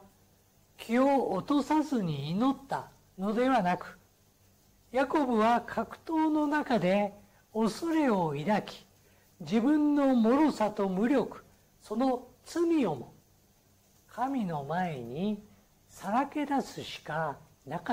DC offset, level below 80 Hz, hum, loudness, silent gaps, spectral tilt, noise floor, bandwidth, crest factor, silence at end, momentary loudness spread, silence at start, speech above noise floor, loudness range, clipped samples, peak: under 0.1%; -64 dBFS; none; -30 LUFS; none; -6.5 dB/octave; -64 dBFS; 16 kHz; 12 dB; 0 s; 14 LU; 0.8 s; 36 dB; 6 LU; under 0.1%; -18 dBFS